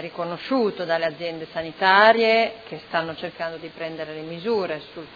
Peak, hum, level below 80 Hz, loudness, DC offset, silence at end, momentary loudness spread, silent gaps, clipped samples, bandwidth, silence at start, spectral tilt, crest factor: -2 dBFS; none; -64 dBFS; -22 LUFS; under 0.1%; 0 s; 17 LU; none; under 0.1%; 5 kHz; 0 s; -6 dB/octave; 20 dB